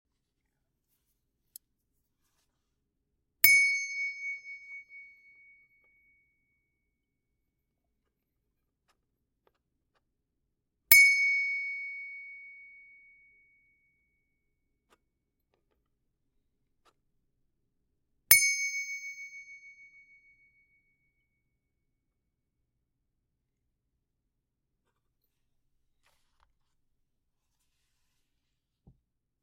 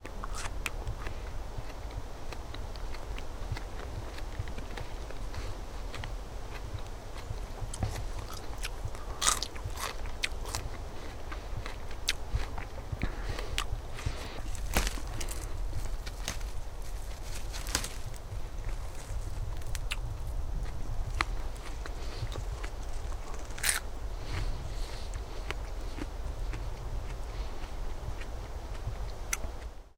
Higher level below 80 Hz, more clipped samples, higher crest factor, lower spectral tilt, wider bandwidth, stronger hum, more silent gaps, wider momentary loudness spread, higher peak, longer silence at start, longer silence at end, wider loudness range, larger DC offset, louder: second, -74 dBFS vs -38 dBFS; neither; about the same, 32 dB vs 34 dB; second, 2.5 dB/octave vs -3 dB/octave; second, 16 kHz vs 18 kHz; neither; neither; first, 26 LU vs 9 LU; about the same, -4 dBFS vs -2 dBFS; first, 3.45 s vs 0 s; first, 9.85 s vs 0.05 s; first, 17 LU vs 7 LU; neither; first, -23 LUFS vs -38 LUFS